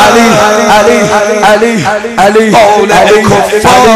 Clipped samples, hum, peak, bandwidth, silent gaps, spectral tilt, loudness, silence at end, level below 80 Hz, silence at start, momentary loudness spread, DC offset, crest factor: 4%; none; 0 dBFS; 16 kHz; none; -4 dB/octave; -5 LUFS; 0 s; -34 dBFS; 0 s; 4 LU; 0.5%; 4 dB